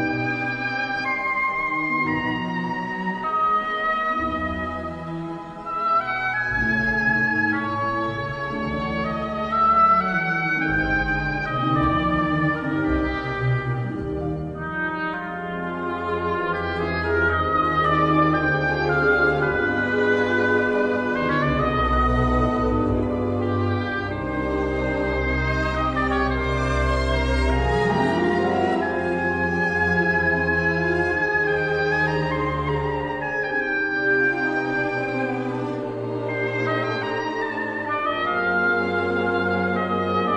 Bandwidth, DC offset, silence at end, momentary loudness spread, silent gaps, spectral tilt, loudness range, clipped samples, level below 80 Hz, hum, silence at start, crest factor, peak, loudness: 10 kHz; under 0.1%; 0 s; 7 LU; none; -7 dB/octave; 4 LU; under 0.1%; -36 dBFS; none; 0 s; 16 dB; -8 dBFS; -22 LUFS